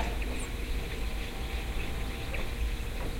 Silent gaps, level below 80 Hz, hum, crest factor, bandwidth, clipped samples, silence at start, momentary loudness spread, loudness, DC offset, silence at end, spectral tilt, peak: none; -34 dBFS; none; 16 dB; 16.5 kHz; under 0.1%; 0 s; 2 LU; -36 LUFS; under 0.1%; 0 s; -4.5 dB/octave; -16 dBFS